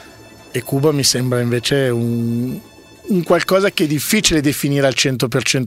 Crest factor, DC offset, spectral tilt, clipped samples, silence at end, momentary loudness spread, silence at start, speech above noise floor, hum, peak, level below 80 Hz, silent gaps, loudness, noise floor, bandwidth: 16 dB; under 0.1%; -4 dB/octave; under 0.1%; 0 s; 9 LU; 0 s; 24 dB; none; 0 dBFS; -44 dBFS; none; -16 LUFS; -41 dBFS; 16.5 kHz